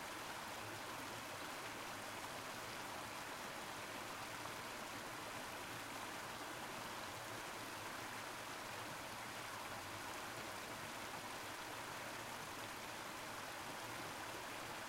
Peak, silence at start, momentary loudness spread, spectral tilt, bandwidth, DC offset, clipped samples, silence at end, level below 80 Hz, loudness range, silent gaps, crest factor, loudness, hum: -34 dBFS; 0 s; 1 LU; -2.5 dB/octave; 16 kHz; under 0.1%; under 0.1%; 0 s; -74 dBFS; 0 LU; none; 16 dB; -48 LUFS; none